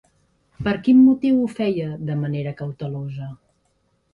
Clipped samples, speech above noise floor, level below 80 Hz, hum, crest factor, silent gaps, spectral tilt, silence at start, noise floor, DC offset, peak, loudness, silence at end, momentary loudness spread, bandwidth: under 0.1%; 47 dB; -52 dBFS; none; 16 dB; none; -9 dB/octave; 0.6 s; -66 dBFS; under 0.1%; -6 dBFS; -20 LUFS; 0.8 s; 16 LU; 5.2 kHz